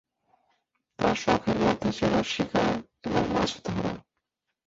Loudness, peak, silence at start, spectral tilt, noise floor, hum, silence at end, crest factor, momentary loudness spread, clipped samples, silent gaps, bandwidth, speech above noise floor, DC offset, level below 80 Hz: -27 LUFS; -8 dBFS; 1 s; -5.5 dB/octave; -82 dBFS; none; 0.65 s; 20 dB; 7 LU; under 0.1%; none; 8 kHz; 56 dB; under 0.1%; -50 dBFS